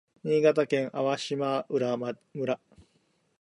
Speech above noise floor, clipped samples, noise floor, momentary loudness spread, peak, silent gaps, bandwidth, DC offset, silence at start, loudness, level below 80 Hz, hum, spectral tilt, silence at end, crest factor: 43 dB; under 0.1%; -70 dBFS; 10 LU; -10 dBFS; none; 11.5 kHz; under 0.1%; 0.25 s; -28 LUFS; -74 dBFS; none; -6 dB/octave; 0.6 s; 20 dB